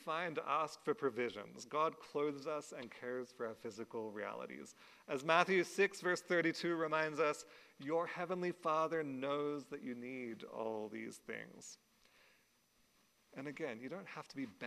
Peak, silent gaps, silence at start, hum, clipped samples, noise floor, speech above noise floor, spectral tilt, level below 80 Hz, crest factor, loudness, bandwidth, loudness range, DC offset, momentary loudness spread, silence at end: -14 dBFS; none; 0 s; none; under 0.1%; -75 dBFS; 35 dB; -4.5 dB/octave; -88 dBFS; 26 dB; -40 LUFS; 14.5 kHz; 13 LU; under 0.1%; 15 LU; 0 s